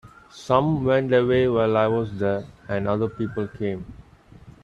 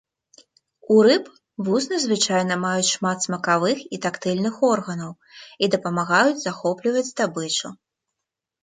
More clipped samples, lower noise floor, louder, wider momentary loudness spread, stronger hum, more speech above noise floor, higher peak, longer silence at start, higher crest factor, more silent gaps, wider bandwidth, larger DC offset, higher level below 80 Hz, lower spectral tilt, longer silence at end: neither; second, -48 dBFS vs -84 dBFS; about the same, -23 LUFS vs -21 LUFS; about the same, 11 LU vs 10 LU; neither; second, 26 dB vs 63 dB; about the same, -4 dBFS vs -6 dBFS; second, 0.05 s vs 0.9 s; about the same, 20 dB vs 18 dB; neither; about the same, 9.2 kHz vs 9.6 kHz; neither; first, -50 dBFS vs -70 dBFS; first, -8 dB/octave vs -4 dB/octave; second, 0.15 s vs 0.9 s